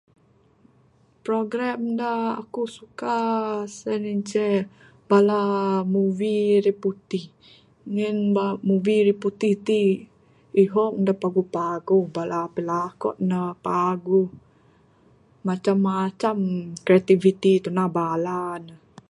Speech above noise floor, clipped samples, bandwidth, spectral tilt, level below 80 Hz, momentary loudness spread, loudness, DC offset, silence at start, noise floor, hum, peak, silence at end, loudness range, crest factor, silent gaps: 37 dB; under 0.1%; 11 kHz; -7.5 dB/octave; -68 dBFS; 10 LU; -23 LUFS; under 0.1%; 1.25 s; -59 dBFS; none; -4 dBFS; 0.35 s; 4 LU; 18 dB; none